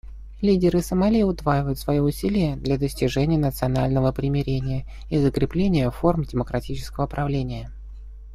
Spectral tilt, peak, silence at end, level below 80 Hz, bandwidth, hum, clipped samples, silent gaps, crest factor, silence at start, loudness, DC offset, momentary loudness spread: -7.5 dB/octave; -4 dBFS; 0 s; -36 dBFS; 15 kHz; none; under 0.1%; none; 18 dB; 0.05 s; -23 LUFS; under 0.1%; 10 LU